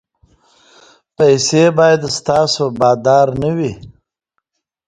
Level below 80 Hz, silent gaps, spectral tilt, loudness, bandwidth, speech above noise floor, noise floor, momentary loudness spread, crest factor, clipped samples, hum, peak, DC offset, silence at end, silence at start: -48 dBFS; none; -4.5 dB/octave; -13 LUFS; 9.6 kHz; 60 dB; -73 dBFS; 7 LU; 16 dB; under 0.1%; none; 0 dBFS; under 0.1%; 0.95 s; 1.2 s